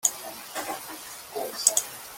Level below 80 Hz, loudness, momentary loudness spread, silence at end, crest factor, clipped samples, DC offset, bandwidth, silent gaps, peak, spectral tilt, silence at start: -70 dBFS; -27 LUFS; 15 LU; 0 s; 30 dB; under 0.1%; under 0.1%; 17 kHz; none; 0 dBFS; 1 dB/octave; 0.05 s